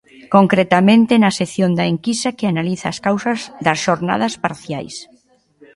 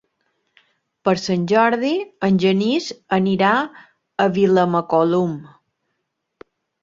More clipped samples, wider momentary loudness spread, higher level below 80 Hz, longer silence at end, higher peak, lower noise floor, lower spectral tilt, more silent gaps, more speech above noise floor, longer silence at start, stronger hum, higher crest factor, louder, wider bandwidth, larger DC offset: neither; first, 12 LU vs 8 LU; first, -56 dBFS vs -62 dBFS; second, 0.75 s vs 1.35 s; about the same, 0 dBFS vs -2 dBFS; second, -54 dBFS vs -75 dBFS; about the same, -5.5 dB/octave vs -6.5 dB/octave; neither; second, 38 dB vs 57 dB; second, 0.3 s vs 1.05 s; neither; about the same, 16 dB vs 18 dB; about the same, -16 LUFS vs -18 LUFS; first, 11.5 kHz vs 7.6 kHz; neither